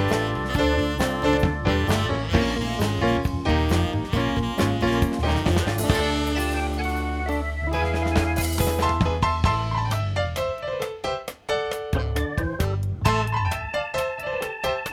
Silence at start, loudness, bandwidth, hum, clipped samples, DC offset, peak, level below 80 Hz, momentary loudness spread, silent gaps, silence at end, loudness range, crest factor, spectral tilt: 0 s; -24 LUFS; 18 kHz; none; under 0.1%; under 0.1%; -4 dBFS; -34 dBFS; 5 LU; none; 0 s; 3 LU; 18 dB; -5.5 dB/octave